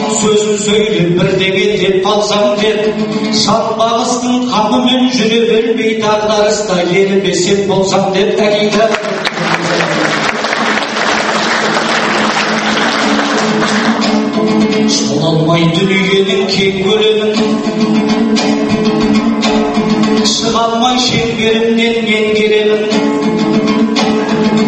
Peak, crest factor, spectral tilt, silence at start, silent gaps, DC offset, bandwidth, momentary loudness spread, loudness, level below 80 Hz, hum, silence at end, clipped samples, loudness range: 0 dBFS; 12 dB; -4 dB/octave; 0 s; none; under 0.1%; 8.8 kHz; 2 LU; -11 LUFS; -44 dBFS; none; 0 s; under 0.1%; 1 LU